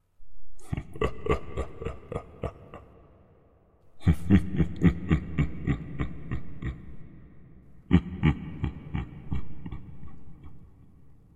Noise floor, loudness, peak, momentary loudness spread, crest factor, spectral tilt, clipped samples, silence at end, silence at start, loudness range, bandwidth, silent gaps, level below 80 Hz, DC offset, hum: -60 dBFS; -30 LUFS; -6 dBFS; 24 LU; 24 dB; -8.5 dB/octave; under 0.1%; 0.2 s; 0.2 s; 8 LU; 11 kHz; none; -40 dBFS; under 0.1%; none